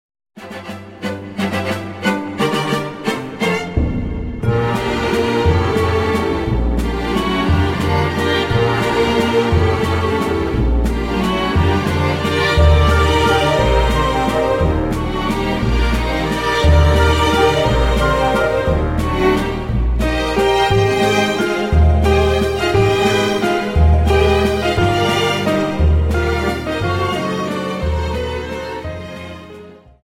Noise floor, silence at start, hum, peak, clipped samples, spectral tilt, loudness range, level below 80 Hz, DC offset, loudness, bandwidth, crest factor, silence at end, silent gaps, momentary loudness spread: -38 dBFS; 0.35 s; none; 0 dBFS; under 0.1%; -6 dB/octave; 5 LU; -22 dBFS; under 0.1%; -16 LUFS; 15.5 kHz; 14 dB; 0.3 s; none; 8 LU